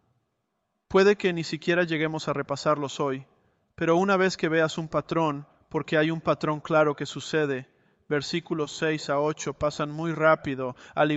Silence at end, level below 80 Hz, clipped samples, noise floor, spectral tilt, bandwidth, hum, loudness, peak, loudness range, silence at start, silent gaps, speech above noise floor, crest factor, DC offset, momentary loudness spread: 0 s; -60 dBFS; under 0.1%; -78 dBFS; -5.5 dB/octave; 8.2 kHz; none; -26 LUFS; -8 dBFS; 2 LU; 0.9 s; none; 52 dB; 20 dB; under 0.1%; 9 LU